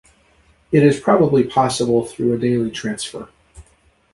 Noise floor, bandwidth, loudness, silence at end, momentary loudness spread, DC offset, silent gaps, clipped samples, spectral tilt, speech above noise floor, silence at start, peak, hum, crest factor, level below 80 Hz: -57 dBFS; 11.5 kHz; -18 LUFS; 0.5 s; 11 LU; under 0.1%; none; under 0.1%; -6 dB/octave; 40 dB; 0.7 s; -2 dBFS; none; 16 dB; -50 dBFS